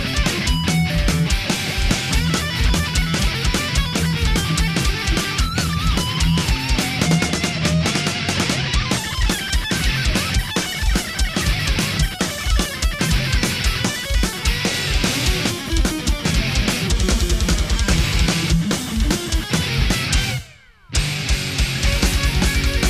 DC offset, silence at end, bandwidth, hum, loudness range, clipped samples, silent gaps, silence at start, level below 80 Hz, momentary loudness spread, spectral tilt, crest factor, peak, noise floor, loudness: 0.1%; 0 s; 15.5 kHz; none; 1 LU; under 0.1%; none; 0 s; -22 dBFS; 3 LU; -4 dB/octave; 16 dB; -2 dBFS; -44 dBFS; -19 LUFS